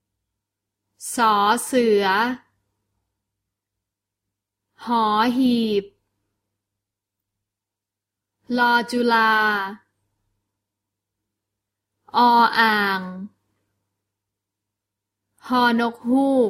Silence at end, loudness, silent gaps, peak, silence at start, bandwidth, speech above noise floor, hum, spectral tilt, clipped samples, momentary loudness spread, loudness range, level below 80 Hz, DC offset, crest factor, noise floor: 0 s; -19 LUFS; none; -2 dBFS; 1 s; 16 kHz; 68 dB; none; -3.5 dB/octave; under 0.1%; 12 LU; 5 LU; -68 dBFS; under 0.1%; 20 dB; -86 dBFS